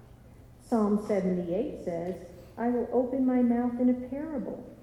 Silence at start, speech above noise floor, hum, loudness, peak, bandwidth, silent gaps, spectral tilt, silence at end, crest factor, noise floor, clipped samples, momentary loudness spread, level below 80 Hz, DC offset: 0 s; 24 dB; none; -29 LUFS; -14 dBFS; 11.5 kHz; none; -9 dB/octave; 0 s; 14 dB; -52 dBFS; under 0.1%; 11 LU; -56 dBFS; under 0.1%